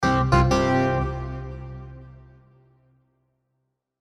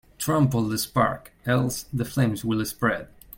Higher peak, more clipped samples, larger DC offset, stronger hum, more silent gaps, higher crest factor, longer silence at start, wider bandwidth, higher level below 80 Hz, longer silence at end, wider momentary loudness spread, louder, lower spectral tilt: about the same, -6 dBFS vs -6 dBFS; neither; neither; neither; neither; about the same, 20 dB vs 18 dB; second, 0 s vs 0.2 s; second, 11 kHz vs 17 kHz; first, -36 dBFS vs -50 dBFS; first, 1.9 s vs 0.3 s; first, 22 LU vs 6 LU; first, -22 LUFS vs -25 LUFS; about the same, -6.5 dB/octave vs -5.5 dB/octave